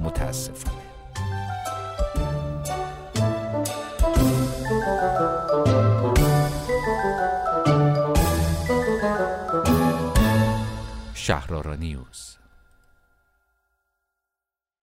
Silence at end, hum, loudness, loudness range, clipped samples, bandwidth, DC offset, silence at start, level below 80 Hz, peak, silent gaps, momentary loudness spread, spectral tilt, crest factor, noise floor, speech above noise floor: 2.5 s; none; -23 LUFS; 11 LU; under 0.1%; 16 kHz; under 0.1%; 0 s; -32 dBFS; -6 dBFS; none; 12 LU; -6 dB/octave; 16 dB; -89 dBFS; 58 dB